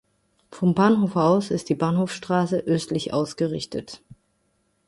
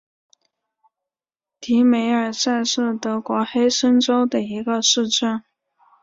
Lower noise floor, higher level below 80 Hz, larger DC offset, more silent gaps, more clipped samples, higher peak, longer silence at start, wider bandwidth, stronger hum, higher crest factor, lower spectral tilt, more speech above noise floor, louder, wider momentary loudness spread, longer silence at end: second, -69 dBFS vs -89 dBFS; first, -58 dBFS vs -66 dBFS; neither; neither; neither; about the same, -6 dBFS vs -4 dBFS; second, 0.5 s vs 1.6 s; first, 11.5 kHz vs 7.8 kHz; neither; about the same, 18 dB vs 16 dB; first, -6.5 dB/octave vs -3 dB/octave; second, 47 dB vs 70 dB; second, -23 LUFS vs -19 LUFS; first, 12 LU vs 7 LU; first, 0.9 s vs 0.6 s